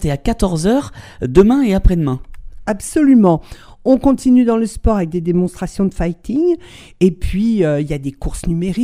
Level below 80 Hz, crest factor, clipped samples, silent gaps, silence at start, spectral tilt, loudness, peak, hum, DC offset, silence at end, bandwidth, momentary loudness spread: -26 dBFS; 14 dB; under 0.1%; none; 0 s; -7.5 dB/octave; -16 LUFS; 0 dBFS; none; under 0.1%; 0 s; 15 kHz; 12 LU